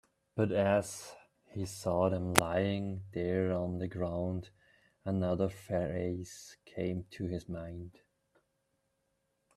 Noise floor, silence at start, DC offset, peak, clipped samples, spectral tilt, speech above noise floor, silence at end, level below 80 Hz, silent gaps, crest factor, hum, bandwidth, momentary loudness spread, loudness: -80 dBFS; 0.35 s; under 0.1%; -2 dBFS; under 0.1%; -5.5 dB/octave; 46 dB; 1.65 s; -62 dBFS; none; 34 dB; none; 15 kHz; 16 LU; -34 LUFS